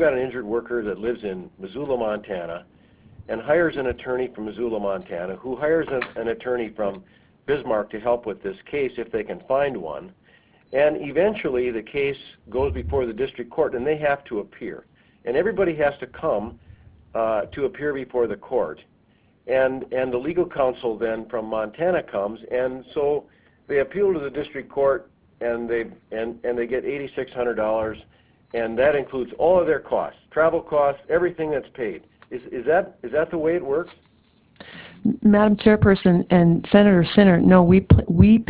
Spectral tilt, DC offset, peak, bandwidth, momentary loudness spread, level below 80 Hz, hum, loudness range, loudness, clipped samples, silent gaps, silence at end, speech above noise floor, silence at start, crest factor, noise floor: -11.5 dB/octave; under 0.1%; 0 dBFS; 4 kHz; 15 LU; -40 dBFS; none; 7 LU; -22 LUFS; under 0.1%; none; 0.05 s; 38 dB; 0 s; 22 dB; -59 dBFS